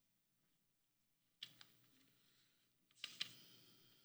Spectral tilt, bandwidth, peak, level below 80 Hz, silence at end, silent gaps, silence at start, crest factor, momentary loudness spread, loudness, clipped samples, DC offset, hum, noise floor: 0 dB/octave; over 20 kHz; -26 dBFS; under -90 dBFS; 0 s; none; 0 s; 34 dB; 17 LU; -53 LUFS; under 0.1%; under 0.1%; none; -83 dBFS